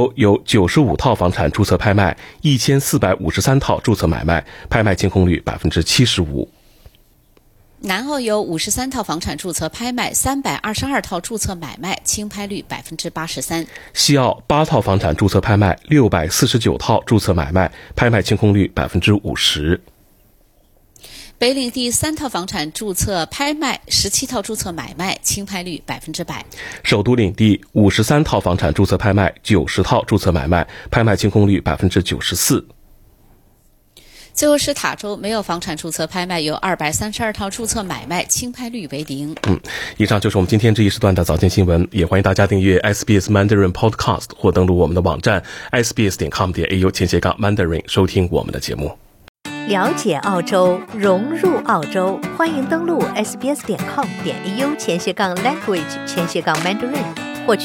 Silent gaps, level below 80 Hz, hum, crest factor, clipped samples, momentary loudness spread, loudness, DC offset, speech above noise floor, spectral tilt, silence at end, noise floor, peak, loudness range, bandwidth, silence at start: 49.29-49.35 s; -38 dBFS; none; 16 dB; under 0.1%; 9 LU; -17 LUFS; under 0.1%; 36 dB; -5 dB/octave; 0 s; -53 dBFS; -2 dBFS; 5 LU; 17 kHz; 0 s